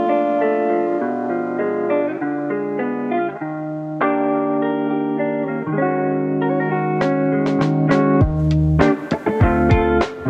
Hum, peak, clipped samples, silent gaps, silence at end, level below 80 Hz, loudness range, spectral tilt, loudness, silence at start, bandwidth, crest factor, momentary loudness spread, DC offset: none; 0 dBFS; under 0.1%; none; 0 s; -32 dBFS; 4 LU; -9 dB/octave; -19 LUFS; 0 s; 8 kHz; 18 dB; 7 LU; under 0.1%